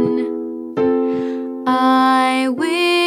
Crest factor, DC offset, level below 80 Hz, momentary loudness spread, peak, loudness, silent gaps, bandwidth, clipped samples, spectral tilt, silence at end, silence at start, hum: 12 dB; under 0.1%; -64 dBFS; 10 LU; -4 dBFS; -17 LUFS; none; 14 kHz; under 0.1%; -4.5 dB/octave; 0 s; 0 s; none